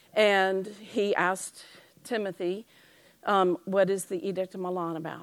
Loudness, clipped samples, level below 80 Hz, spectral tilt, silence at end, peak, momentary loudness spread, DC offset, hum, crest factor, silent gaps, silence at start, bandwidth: -28 LUFS; under 0.1%; -82 dBFS; -4.5 dB/octave; 0 s; -10 dBFS; 12 LU; under 0.1%; none; 20 dB; none; 0.15 s; 16 kHz